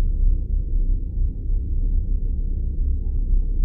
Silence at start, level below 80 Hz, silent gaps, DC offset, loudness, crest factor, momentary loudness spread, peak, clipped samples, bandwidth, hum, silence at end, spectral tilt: 0 s; -20 dBFS; none; under 0.1%; -27 LUFS; 12 dB; 3 LU; -8 dBFS; under 0.1%; 0.6 kHz; none; 0 s; -14 dB/octave